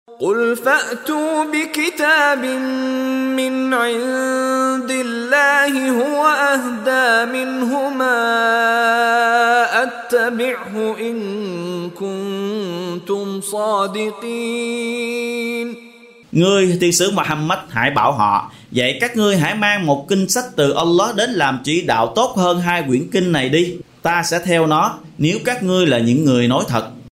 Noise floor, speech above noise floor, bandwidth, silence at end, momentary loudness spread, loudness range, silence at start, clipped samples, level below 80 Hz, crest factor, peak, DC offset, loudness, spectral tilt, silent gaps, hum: -43 dBFS; 26 dB; 16 kHz; 0.05 s; 9 LU; 6 LU; 0.1 s; under 0.1%; -56 dBFS; 16 dB; -2 dBFS; under 0.1%; -17 LUFS; -4 dB/octave; none; none